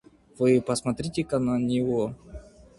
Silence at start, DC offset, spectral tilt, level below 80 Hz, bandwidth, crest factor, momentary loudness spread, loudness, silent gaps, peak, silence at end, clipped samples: 0.4 s; under 0.1%; -6.5 dB/octave; -52 dBFS; 11.5 kHz; 18 dB; 19 LU; -26 LUFS; none; -10 dBFS; 0.35 s; under 0.1%